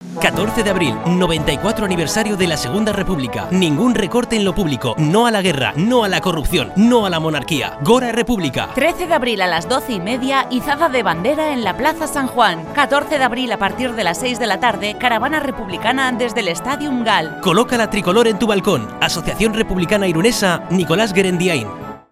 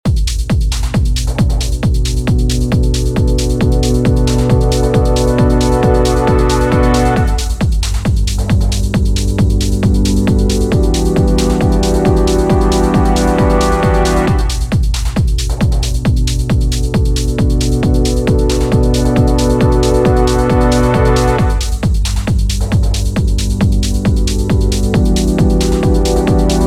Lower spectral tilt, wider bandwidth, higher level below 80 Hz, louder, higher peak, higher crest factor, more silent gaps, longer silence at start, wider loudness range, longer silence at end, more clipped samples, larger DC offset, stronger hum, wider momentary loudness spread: second, -4.5 dB/octave vs -6 dB/octave; first, 15.5 kHz vs 14 kHz; second, -36 dBFS vs -14 dBFS; second, -16 LUFS vs -13 LUFS; about the same, 0 dBFS vs 0 dBFS; first, 16 dB vs 10 dB; neither; about the same, 0 s vs 0.05 s; about the same, 2 LU vs 3 LU; about the same, 0.1 s vs 0 s; neither; neither; neither; about the same, 5 LU vs 4 LU